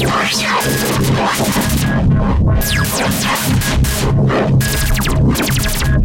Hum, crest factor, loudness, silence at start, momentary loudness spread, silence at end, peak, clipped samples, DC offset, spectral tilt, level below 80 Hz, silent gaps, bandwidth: none; 8 dB; -14 LUFS; 0 s; 1 LU; 0 s; -4 dBFS; under 0.1%; under 0.1%; -4.5 dB/octave; -22 dBFS; none; 17 kHz